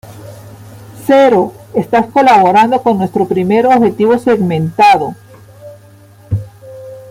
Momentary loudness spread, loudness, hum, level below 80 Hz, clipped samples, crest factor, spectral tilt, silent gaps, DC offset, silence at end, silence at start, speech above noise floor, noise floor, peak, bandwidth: 21 LU; -11 LUFS; none; -48 dBFS; under 0.1%; 12 dB; -7 dB/octave; none; under 0.1%; 0 s; 0.05 s; 30 dB; -40 dBFS; 0 dBFS; 16 kHz